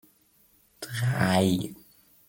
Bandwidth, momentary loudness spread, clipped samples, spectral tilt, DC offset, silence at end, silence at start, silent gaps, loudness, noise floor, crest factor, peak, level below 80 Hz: 17 kHz; 16 LU; under 0.1%; -5.5 dB/octave; under 0.1%; 0.55 s; 0.8 s; none; -26 LUFS; -63 dBFS; 20 dB; -10 dBFS; -62 dBFS